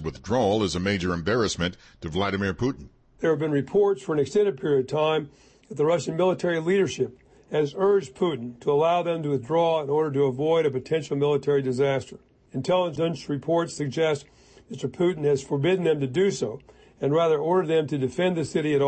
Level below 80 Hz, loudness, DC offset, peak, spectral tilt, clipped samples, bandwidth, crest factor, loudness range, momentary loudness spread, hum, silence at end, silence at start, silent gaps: -54 dBFS; -25 LUFS; under 0.1%; -12 dBFS; -6 dB/octave; under 0.1%; 8.8 kHz; 12 dB; 2 LU; 8 LU; none; 0 s; 0 s; none